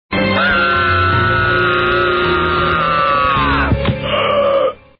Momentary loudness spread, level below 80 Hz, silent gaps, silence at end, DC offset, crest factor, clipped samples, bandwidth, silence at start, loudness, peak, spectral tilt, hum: 3 LU; -30 dBFS; none; 0.25 s; under 0.1%; 10 dB; under 0.1%; 5.6 kHz; 0.1 s; -13 LUFS; -4 dBFS; -3 dB/octave; none